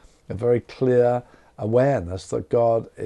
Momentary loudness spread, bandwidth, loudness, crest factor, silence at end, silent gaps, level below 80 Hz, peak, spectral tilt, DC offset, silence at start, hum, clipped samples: 10 LU; 10.5 kHz; -22 LUFS; 16 dB; 0 s; none; -54 dBFS; -6 dBFS; -8 dB/octave; under 0.1%; 0.3 s; none; under 0.1%